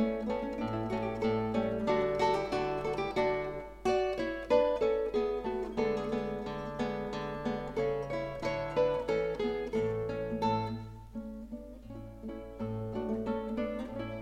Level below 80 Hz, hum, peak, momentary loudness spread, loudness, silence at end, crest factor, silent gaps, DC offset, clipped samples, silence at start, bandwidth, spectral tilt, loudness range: -52 dBFS; none; -16 dBFS; 13 LU; -33 LUFS; 0 s; 18 dB; none; under 0.1%; under 0.1%; 0 s; 12 kHz; -7 dB/octave; 6 LU